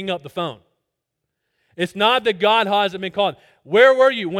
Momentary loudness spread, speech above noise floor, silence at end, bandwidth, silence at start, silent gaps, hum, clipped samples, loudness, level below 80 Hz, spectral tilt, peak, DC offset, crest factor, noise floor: 14 LU; 61 dB; 0 s; 13.5 kHz; 0 s; none; none; under 0.1%; -18 LUFS; -66 dBFS; -4.5 dB/octave; 0 dBFS; under 0.1%; 20 dB; -79 dBFS